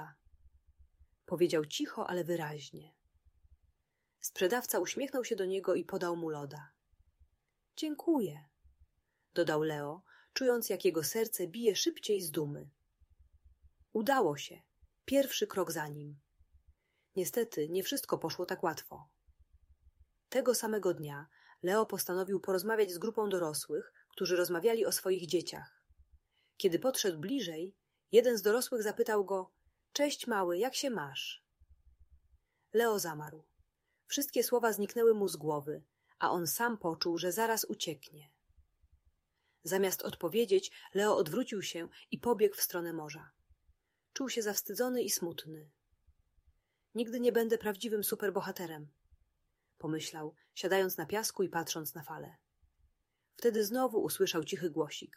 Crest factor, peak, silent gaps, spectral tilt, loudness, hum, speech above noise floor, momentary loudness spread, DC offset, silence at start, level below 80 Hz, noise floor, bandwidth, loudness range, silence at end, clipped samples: 22 dB; -12 dBFS; none; -3.5 dB/octave; -34 LUFS; none; 49 dB; 14 LU; under 0.1%; 0 s; -74 dBFS; -83 dBFS; 16 kHz; 5 LU; 0.1 s; under 0.1%